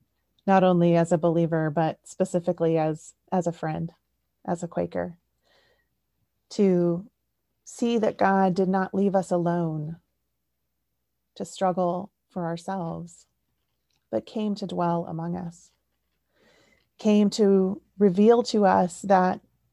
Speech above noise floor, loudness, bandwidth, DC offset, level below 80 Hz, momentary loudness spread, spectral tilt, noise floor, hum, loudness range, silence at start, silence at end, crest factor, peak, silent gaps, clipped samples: 56 dB; -24 LUFS; 11.5 kHz; under 0.1%; -64 dBFS; 15 LU; -7 dB/octave; -80 dBFS; none; 9 LU; 0.45 s; 0.35 s; 18 dB; -6 dBFS; none; under 0.1%